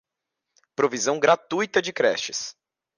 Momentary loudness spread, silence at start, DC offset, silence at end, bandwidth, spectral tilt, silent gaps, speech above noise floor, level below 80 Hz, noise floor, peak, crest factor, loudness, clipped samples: 11 LU; 0.8 s; under 0.1%; 0.45 s; 10.5 kHz; -2.5 dB/octave; none; 61 dB; -74 dBFS; -84 dBFS; -6 dBFS; 18 dB; -23 LUFS; under 0.1%